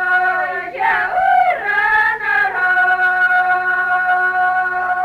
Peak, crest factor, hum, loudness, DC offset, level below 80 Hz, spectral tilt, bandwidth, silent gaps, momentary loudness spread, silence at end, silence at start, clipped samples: -4 dBFS; 12 dB; none; -15 LUFS; under 0.1%; -54 dBFS; -3.5 dB/octave; 13.5 kHz; none; 4 LU; 0 s; 0 s; under 0.1%